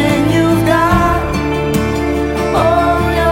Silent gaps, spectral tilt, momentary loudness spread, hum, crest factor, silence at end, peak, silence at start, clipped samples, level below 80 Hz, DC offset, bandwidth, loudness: none; -6.5 dB/octave; 5 LU; none; 12 dB; 0 s; 0 dBFS; 0 s; under 0.1%; -24 dBFS; under 0.1%; 16.5 kHz; -13 LUFS